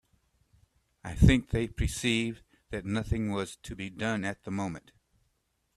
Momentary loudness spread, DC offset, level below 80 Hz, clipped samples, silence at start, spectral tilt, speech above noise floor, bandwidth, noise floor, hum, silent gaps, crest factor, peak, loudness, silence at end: 17 LU; under 0.1%; -40 dBFS; under 0.1%; 1.05 s; -5.5 dB/octave; 47 dB; 13.5 kHz; -76 dBFS; none; none; 24 dB; -8 dBFS; -30 LUFS; 0.95 s